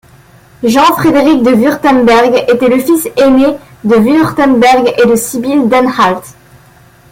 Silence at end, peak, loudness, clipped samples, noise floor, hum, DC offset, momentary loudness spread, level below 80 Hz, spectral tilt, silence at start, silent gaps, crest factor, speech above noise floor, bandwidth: 0.8 s; 0 dBFS; -8 LUFS; under 0.1%; -41 dBFS; none; under 0.1%; 5 LU; -42 dBFS; -5 dB/octave; 0.6 s; none; 8 dB; 33 dB; 17 kHz